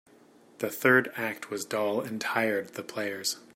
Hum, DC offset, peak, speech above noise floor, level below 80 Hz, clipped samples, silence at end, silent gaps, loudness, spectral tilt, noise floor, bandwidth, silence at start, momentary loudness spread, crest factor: none; under 0.1%; -8 dBFS; 28 dB; -78 dBFS; under 0.1%; 0.15 s; none; -29 LUFS; -3.5 dB/octave; -57 dBFS; 16 kHz; 0.6 s; 12 LU; 22 dB